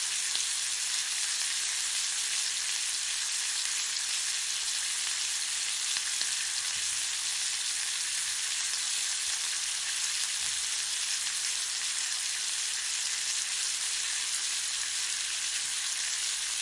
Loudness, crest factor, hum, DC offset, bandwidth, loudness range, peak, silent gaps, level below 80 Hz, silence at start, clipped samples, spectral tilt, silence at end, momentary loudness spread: -29 LUFS; 22 dB; none; under 0.1%; 11.5 kHz; 1 LU; -10 dBFS; none; -70 dBFS; 0 s; under 0.1%; 4.5 dB/octave; 0 s; 1 LU